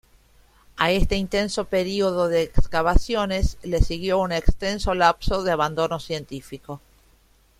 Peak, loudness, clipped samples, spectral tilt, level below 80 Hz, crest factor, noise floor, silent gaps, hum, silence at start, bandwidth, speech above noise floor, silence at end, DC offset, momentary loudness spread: -2 dBFS; -23 LUFS; under 0.1%; -5 dB/octave; -28 dBFS; 20 dB; -58 dBFS; none; none; 0.75 s; 14.5 kHz; 37 dB; 0.8 s; under 0.1%; 15 LU